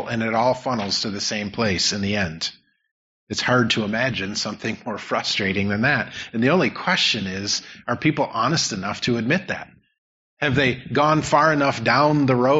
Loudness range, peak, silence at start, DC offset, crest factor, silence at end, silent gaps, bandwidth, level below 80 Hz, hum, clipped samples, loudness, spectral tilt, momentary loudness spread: 3 LU; -4 dBFS; 0 s; under 0.1%; 18 dB; 0 s; 2.91-3.27 s, 9.98-10.37 s; 8 kHz; -54 dBFS; none; under 0.1%; -21 LUFS; -3 dB/octave; 8 LU